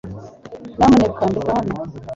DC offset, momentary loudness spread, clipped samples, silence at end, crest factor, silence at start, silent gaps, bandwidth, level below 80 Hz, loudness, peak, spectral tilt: under 0.1%; 23 LU; under 0.1%; 0 s; 16 dB; 0.05 s; none; 7.8 kHz; -40 dBFS; -17 LUFS; -2 dBFS; -7 dB/octave